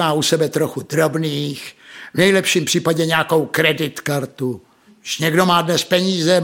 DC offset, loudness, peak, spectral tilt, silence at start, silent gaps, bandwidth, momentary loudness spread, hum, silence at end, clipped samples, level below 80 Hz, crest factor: under 0.1%; -17 LUFS; -2 dBFS; -4 dB/octave; 0 s; none; 17 kHz; 12 LU; none; 0 s; under 0.1%; -60 dBFS; 16 dB